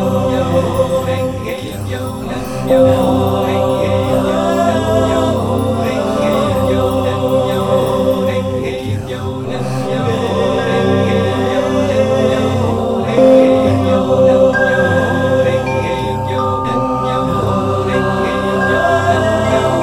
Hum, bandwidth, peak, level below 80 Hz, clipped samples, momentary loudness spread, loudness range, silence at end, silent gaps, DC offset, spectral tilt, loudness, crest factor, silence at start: none; 17.5 kHz; 0 dBFS; -36 dBFS; under 0.1%; 9 LU; 5 LU; 0 s; none; 0.6%; -6.5 dB/octave; -14 LUFS; 14 dB; 0 s